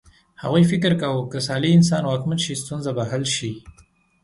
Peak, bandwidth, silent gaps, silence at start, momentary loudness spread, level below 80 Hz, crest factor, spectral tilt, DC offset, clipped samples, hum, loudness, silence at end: -4 dBFS; 11.5 kHz; none; 0.4 s; 11 LU; -54 dBFS; 16 dB; -5.5 dB/octave; under 0.1%; under 0.1%; none; -21 LUFS; 0.55 s